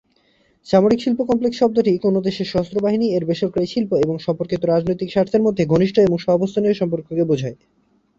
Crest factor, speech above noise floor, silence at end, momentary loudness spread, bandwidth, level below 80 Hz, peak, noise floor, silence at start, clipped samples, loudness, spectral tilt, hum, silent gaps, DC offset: 16 dB; 42 dB; 0.65 s; 6 LU; 7.8 kHz; -52 dBFS; -2 dBFS; -60 dBFS; 0.65 s; under 0.1%; -19 LUFS; -7.5 dB/octave; none; none; under 0.1%